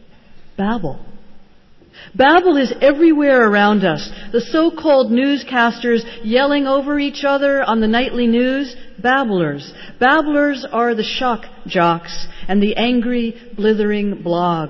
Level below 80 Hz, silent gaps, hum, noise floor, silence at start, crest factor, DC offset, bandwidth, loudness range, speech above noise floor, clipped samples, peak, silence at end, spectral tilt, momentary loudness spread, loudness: -44 dBFS; none; none; -45 dBFS; 0.3 s; 14 dB; under 0.1%; 7 kHz; 4 LU; 30 dB; under 0.1%; -2 dBFS; 0 s; -6.5 dB/octave; 11 LU; -16 LUFS